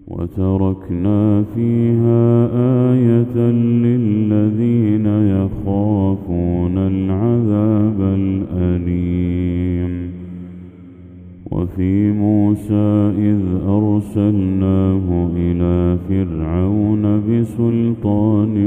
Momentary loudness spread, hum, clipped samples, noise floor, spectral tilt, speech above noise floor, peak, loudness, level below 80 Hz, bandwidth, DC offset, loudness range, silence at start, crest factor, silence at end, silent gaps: 5 LU; none; under 0.1%; -37 dBFS; -11 dB/octave; 23 dB; -2 dBFS; -16 LUFS; -38 dBFS; 3.7 kHz; under 0.1%; 5 LU; 0.05 s; 14 dB; 0 s; none